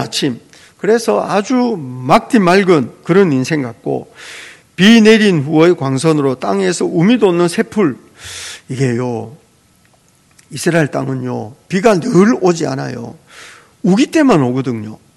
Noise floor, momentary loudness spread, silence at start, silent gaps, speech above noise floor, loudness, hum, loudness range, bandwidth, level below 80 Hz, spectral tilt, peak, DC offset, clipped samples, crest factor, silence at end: -51 dBFS; 16 LU; 0 s; none; 39 dB; -13 LUFS; none; 8 LU; 12.5 kHz; -54 dBFS; -5.5 dB/octave; 0 dBFS; under 0.1%; 0.4%; 14 dB; 0.2 s